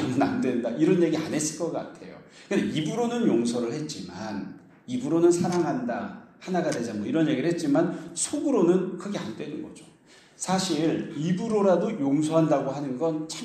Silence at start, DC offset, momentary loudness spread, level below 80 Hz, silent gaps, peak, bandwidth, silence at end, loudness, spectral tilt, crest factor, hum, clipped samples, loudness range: 0 s; under 0.1%; 13 LU; -68 dBFS; none; -8 dBFS; 13 kHz; 0 s; -26 LUFS; -5.5 dB/octave; 18 dB; none; under 0.1%; 3 LU